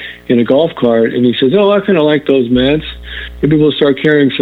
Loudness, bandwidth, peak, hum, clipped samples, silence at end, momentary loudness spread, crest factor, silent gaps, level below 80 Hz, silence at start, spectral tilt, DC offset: -11 LUFS; 4.7 kHz; 0 dBFS; none; under 0.1%; 0 s; 7 LU; 10 dB; none; -36 dBFS; 0 s; -8.5 dB/octave; under 0.1%